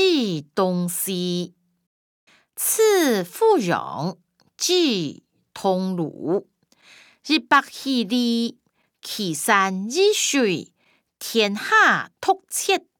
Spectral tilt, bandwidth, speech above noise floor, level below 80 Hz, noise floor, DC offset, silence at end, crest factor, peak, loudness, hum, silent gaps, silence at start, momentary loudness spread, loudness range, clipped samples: -3.5 dB/octave; over 20 kHz; 32 dB; -76 dBFS; -53 dBFS; under 0.1%; 0.2 s; 20 dB; -4 dBFS; -21 LUFS; none; 1.87-2.27 s; 0 s; 12 LU; 4 LU; under 0.1%